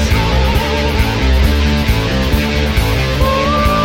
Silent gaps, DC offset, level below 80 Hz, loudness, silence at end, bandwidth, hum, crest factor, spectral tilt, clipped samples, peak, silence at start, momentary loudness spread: none; under 0.1%; -16 dBFS; -14 LUFS; 0 s; 16.5 kHz; none; 12 dB; -5.5 dB/octave; under 0.1%; -2 dBFS; 0 s; 2 LU